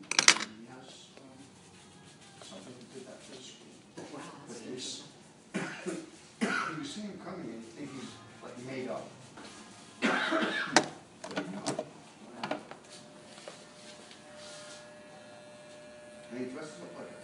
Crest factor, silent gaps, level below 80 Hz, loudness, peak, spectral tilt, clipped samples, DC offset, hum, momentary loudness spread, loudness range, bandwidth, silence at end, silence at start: 36 dB; none; -78 dBFS; -34 LUFS; -2 dBFS; -2 dB/octave; under 0.1%; under 0.1%; none; 21 LU; 16 LU; 14.5 kHz; 0 s; 0 s